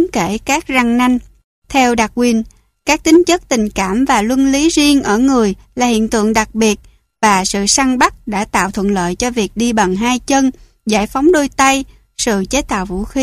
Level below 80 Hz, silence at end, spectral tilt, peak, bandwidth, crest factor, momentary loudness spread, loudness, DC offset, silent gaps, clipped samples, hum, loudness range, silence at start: -36 dBFS; 0 s; -3.5 dB/octave; 0 dBFS; 15.5 kHz; 14 dB; 7 LU; -14 LUFS; under 0.1%; 1.44-1.62 s; under 0.1%; none; 2 LU; 0 s